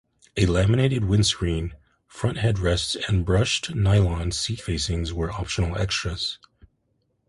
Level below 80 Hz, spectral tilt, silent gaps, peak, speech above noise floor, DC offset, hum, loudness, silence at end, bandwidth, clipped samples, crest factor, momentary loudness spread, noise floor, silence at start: -34 dBFS; -5 dB/octave; none; -6 dBFS; 48 dB; under 0.1%; none; -24 LUFS; 0.9 s; 11.5 kHz; under 0.1%; 18 dB; 9 LU; -71 dBFS; 0.35 s